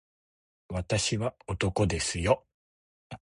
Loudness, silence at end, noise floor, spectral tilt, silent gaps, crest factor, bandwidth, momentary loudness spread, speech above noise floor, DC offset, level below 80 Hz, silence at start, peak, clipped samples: -29 LUFS; 0.15 s; under -90 dBFS; -4.5 dB/octave; 2.54-3.10 s; 22 dB; 11.5 kHz; 11 LU; over 61 dB; under 0.1%; -46 dBFS; 0.7 s; -10 dBFS; under 0.1%